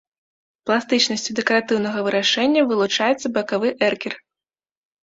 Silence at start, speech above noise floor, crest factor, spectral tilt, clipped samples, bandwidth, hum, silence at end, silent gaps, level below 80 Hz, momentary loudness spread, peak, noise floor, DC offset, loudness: 0.65 s; 70 dB; 18 dB; -3 dB/octave; under 0.1%; 8 kHz; none; 0.85 s; none; -66 dBFS; 6 LU; -2 dBFS; -90 dBFS; under 0.1%; -20 LUFS